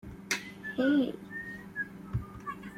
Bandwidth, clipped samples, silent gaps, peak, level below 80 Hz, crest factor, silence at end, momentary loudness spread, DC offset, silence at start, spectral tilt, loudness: 15.5 kHz; under 0.1%; none; -14 dBFS; -54 dBFS; 20 dB; 0 s; 13 LU; under 0.1%; 0.05 s; -5 dB/octave; -34 LUFS